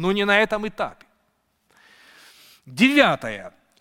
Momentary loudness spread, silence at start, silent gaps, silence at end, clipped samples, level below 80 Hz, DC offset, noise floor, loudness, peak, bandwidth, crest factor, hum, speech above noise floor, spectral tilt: 17 LU; 0 s; none; 0.3 s; under 0.1%; -54 dBFS; under 0.1%; -69 dBFS; -20 LUFS; -2 dBFS; 16.5 kHz; 20 dB; none; 49 dB; -5 dB/octave